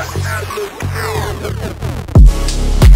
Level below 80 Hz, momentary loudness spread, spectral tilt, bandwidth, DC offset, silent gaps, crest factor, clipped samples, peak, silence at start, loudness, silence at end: -14 dBFS; 12 LU; -6 dB/octave; 16 kHz; under 0.1%; none; 12 dB; 0.9%; 0 dBFS; 0 s; -16 LUFS; 0 s